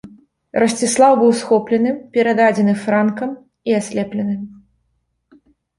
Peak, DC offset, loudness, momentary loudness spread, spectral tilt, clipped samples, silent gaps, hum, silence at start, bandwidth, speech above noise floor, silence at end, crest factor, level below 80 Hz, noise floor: -2 dBFS; under 0.1%; -16 LUFS; 13 LU; -5 dB/octave; under 0.1%; none; none; 0.05 s; 11.5 kHz; 52 dB; 1.25 s; 16 dB; -60 dBFS; -68 dBFS